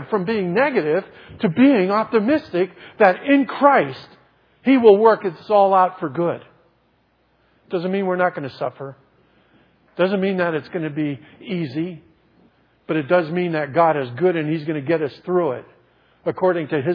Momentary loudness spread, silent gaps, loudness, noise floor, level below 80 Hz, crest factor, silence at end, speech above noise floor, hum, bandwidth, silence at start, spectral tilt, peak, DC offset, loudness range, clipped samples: 13 LU; none; -19 LUFS; -62 dBFS; -66 dBFS; 20 dB; 0 s; 43 dB; none; 5.4 kHz; 0 s; -9.5 dB/octave; 0 dBFS; under 0.1%; 8 LU; under 0.1%